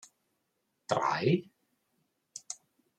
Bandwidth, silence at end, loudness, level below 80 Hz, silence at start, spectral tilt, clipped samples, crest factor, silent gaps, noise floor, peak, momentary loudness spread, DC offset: 11.5 kHz; 0.45 s; -31 LUFS; -78 dBFS; 0.9 s; -5.5 dB/octave; under 0.1%; 26 dB; none; -80 dBFS; -10 dBFS; 20 LU; under 0.1%